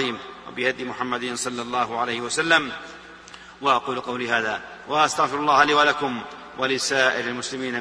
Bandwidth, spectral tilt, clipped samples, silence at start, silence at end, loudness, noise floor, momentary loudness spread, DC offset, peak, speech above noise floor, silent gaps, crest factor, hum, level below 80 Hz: 11 kHz; -2.5 dB/octave; under 0.1%; 0 s; 0 s; -22 LUFS; -44 dBFS; 17 LU; under 0.1%; -4 dBFS; 21 dB; none; 20 dB; none; -60 dBFS